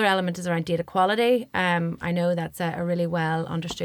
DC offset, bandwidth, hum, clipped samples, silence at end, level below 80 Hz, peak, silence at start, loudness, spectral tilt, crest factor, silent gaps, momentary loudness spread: under 0.1%; 18 kHz; none; under 0.1%; 0 s; -58 dBFS; -8 dBFS; 0 s; -25 LUFS; -6 dB/octave; 16 dB; none; 6 LU